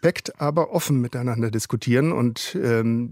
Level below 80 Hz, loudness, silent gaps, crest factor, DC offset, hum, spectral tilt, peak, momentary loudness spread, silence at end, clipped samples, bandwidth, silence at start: -60 dBFS; -23 LUFS; none; 16 dB; under 0.1%; none; -6 dB/octave; -4 dBFS; 5 LU; 0 s; under 0.1%; 16 kHz; 0.05 s